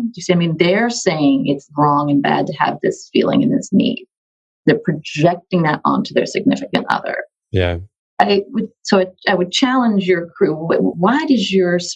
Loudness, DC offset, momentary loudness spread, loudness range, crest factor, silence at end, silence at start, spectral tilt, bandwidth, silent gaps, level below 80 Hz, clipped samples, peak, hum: -16 LUFS; under 0.1%; 6 LU; 2 LU; 16 dB; 0 s; 0 s; -5.5 dB/octave; 9 kHz; 4.17-4.64 s, 7.99-8.17 s; -54 dBFS; under 0.1%; 0 dBFS; none